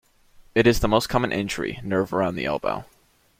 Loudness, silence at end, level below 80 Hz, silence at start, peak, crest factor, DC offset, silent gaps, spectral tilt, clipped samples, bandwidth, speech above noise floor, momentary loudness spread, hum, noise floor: -23 LUFS; 0.55 s; -40 dBFS; 0.4 s; -4 dBFS; 20 dB; under 0.1%; none; -5.5 dB/octave; under 0.1%; 16.5 kHz; 30 dB; 9 LU; none; -53 dBFS